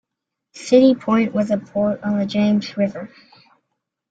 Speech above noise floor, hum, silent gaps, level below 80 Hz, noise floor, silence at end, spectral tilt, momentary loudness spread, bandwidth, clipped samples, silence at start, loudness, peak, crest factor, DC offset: 63 dB; none; none; -60 dBFS; -81 dBFS; 1.05 s; -6.5 dB/octave; 13 LU; 9 kHz; under 0.1%; 0.55 s; -18 LUFS; -2 dBFS; 18 dB; under 0.1%